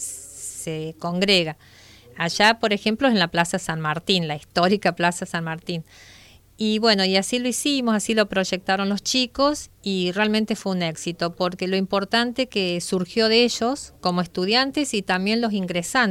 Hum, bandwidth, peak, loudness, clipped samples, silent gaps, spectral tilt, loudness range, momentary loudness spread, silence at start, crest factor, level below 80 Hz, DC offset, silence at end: none; 16 kHz; -2 dBFS; -22 LUFS; under 0.1%; none; -4 dB/octave; 2 LU; 10 LU; 0 s; 20 dB; -56 dBFS; under 0.1%; 0 s